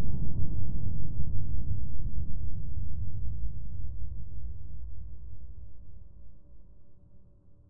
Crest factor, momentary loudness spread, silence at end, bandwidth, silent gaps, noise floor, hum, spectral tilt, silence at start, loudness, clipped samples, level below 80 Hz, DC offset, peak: 12 dB; 18 LU; 0 s; 1.1 kHz; none; -54 dBFS; none; -14 dB/octave; 0 s; -39 LUFS; under 0.1%; -38 dBFS; 5%; -10 dBFS